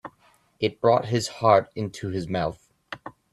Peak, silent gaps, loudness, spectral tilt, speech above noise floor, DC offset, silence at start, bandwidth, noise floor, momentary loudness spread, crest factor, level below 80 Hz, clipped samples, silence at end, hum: -4 dBFS; none; -24 LUFS; -5.5 dB/octave; 38 dB; under 0.1%; 0.05 s; 13 kHz; -61 dBFS; 20 LU; 22 dB; -58 dBFS; under 0.1%; 0.25 s; none